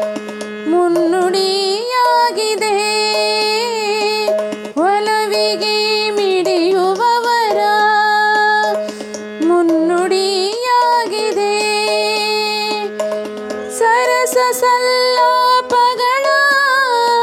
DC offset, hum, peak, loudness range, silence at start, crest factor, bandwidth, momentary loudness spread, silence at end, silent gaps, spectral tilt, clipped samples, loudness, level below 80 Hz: under 0.1%; none; -2 dBFS; 2 LU; 0 s; 12 dB; 16.5 kHz; 8 LU; 0 s; none; -2 dB/octave; under 0.1%; -14 LUFS; -68 dBFS